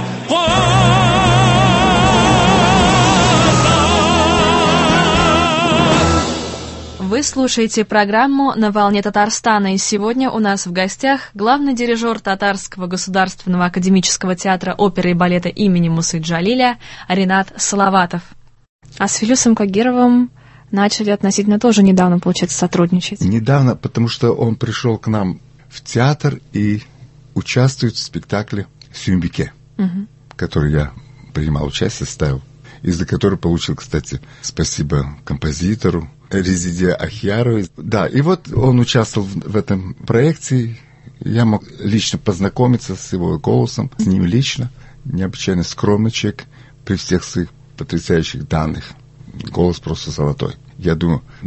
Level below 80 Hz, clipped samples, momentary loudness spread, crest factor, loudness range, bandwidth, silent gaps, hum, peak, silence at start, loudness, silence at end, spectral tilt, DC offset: -32 dBFS; under 0.1%; 12 LU; 16 dB; 9 LU; 8.6 kHz; 18.69-18.79 s; none; 0 dBFS; 0 s; -15 LUFS; 0 s; -5 dB/octave; under 0.1%